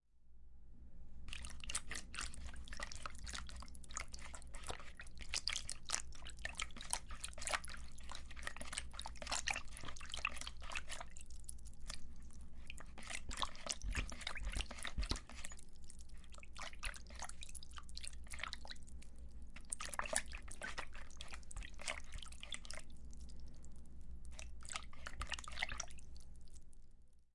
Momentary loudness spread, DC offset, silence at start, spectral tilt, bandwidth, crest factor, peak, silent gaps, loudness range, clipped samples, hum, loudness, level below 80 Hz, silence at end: 16 LU; under 0.1%; 0.15 s; -1.5 dB/octave; 11.5 kHz; 28 dB; -16 dBFS; none; 6 LU; under 0.1%; none; -47 LUFS; -52 dBFS; 0.05 s